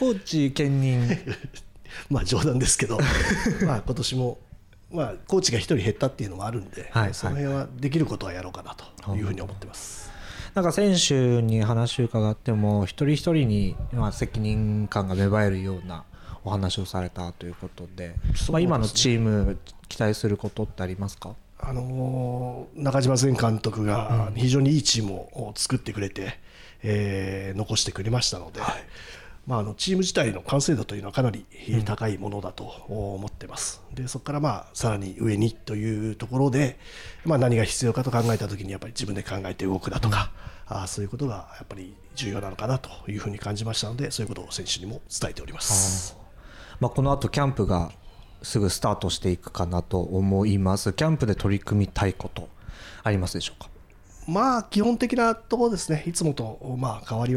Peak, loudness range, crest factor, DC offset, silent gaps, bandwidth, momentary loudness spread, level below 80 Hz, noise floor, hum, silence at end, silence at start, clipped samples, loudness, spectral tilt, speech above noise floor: -8 dBFS; 6 LU; 18 dB; under 0.1%; none; 15 kHz; 15 LU; -40 dBFS; -48 dBFS; none; 0 s; 0 s; under 0.1%; -26 LUFS; -5 dB/octave; 23 dB